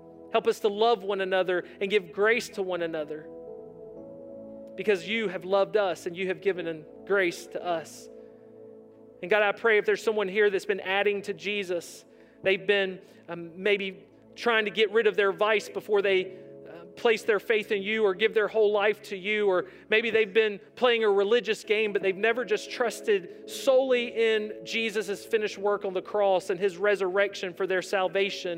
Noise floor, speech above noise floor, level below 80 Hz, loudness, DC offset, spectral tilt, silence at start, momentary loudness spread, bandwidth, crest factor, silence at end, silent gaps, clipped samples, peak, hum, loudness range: -50 dBFS; 24 dB; -76 dBFS; -27 LUFS; under 0.1%; -4 dB/octave; 0 s; 15 LU; 16 kHz; 18 dB; 0 s; none; under 0.1%; -8 dBFS; none; 5 LU